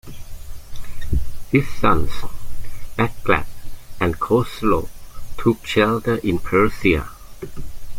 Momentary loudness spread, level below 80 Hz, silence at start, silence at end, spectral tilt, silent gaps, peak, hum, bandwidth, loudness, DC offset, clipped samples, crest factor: 21 LU; -32 dBFS; 0.05 s; 0 s; -6.5 dB/octave; none; -2 dBFS; none; 16.5 kHz; -20 LUFS; under 0.1%; under 0.1%; 18 dB